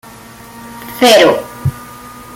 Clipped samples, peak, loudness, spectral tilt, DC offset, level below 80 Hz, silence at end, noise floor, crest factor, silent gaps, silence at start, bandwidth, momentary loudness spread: under 0.1%; 0 dBFS; -10 LUFS; -4 dB/octave; under 0.1%; -42 dBFS; 0.15 s; -35 dBFS; 14 dB; none; 0.55 s; 17 kHz; 25 LU